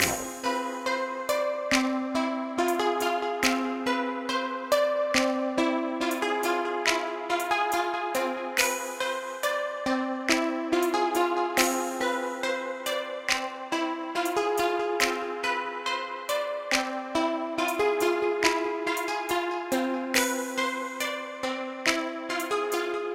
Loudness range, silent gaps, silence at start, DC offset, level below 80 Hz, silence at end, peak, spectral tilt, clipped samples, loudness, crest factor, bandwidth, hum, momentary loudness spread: 2 LU; none; 0 s; under 0.1%; -62 dBFS; 0 s; -8 dBFS; -2 dB/octave; under 0.1%; -27 LUFS; 20 dB; 16.5 kHz; none; 5 LU